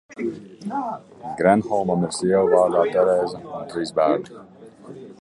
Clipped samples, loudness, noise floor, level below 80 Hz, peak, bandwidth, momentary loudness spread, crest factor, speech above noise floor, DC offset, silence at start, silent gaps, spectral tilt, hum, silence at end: under 0.1%; -21 LUFS; -41 dBFS; -58 dBFS; -2 dBFS; 11.5 kHz; 17 LU; 20 dB; 20 dB; under 0.1%; 0.1 s; none; -6 dB/octave; none; 0.1 s